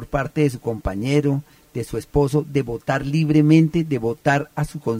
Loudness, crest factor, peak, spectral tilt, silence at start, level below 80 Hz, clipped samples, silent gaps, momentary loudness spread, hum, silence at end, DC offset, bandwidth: -20 LUFS; 18 dB; -2 dBFS; -7.5 dB/octave; 0 s; -40 dBFS; under 0.1%; none; 12 LU; none; 0 s; under 0.1%; 15.5 kHz